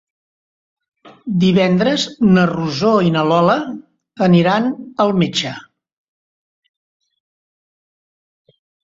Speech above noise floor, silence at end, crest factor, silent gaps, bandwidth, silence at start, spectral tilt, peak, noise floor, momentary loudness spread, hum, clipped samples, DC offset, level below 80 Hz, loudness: over 75 dB; 3.3 s; 16 dB; none; 7.6 kHz; 1.05 s; -6.5 dB/octave; -2 dBFS; under -90 dBFS; 11 LU; none; under 0.1%; under 0.1%; -54 dBFS; -15 LUFS